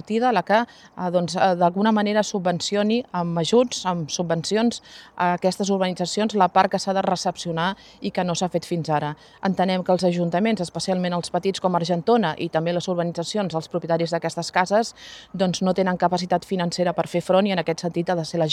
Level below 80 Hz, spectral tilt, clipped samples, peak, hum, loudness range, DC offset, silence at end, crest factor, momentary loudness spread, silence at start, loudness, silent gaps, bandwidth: -62 dBFS; -5 dB/octave; under 0.1%; -2 dBFS; none; 2 LU; under 0.1%; 0 s; 20 dB; 6 LU; 0.05 s; -23 LUFS; none; 13 kHz